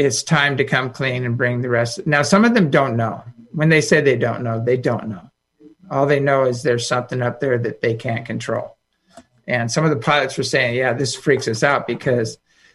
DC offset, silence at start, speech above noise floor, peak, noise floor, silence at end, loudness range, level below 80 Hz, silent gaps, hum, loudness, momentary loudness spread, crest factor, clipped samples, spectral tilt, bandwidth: under 0.1%; 0 s; 32 dB; -2 dBFS; -50 dBFS; 0.4 s; 4 LU; -58 dBFS; none; none; -18 LUFS; 10 LU; 16 dB; under 0.1%; -5 dB/octave; 12 kHz